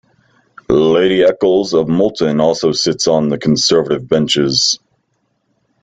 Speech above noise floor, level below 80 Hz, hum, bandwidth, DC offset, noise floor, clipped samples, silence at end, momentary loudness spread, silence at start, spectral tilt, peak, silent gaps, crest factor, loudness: 52 dB; -48 dBFS; none; 9.2 kHz; under 0.1%; -65 dBFS; under 0.1%; 1.05 s; 3 LU; 0.7 s; -4 dB/octave; 0 dBFS; none; 14 dB; -13 LUFS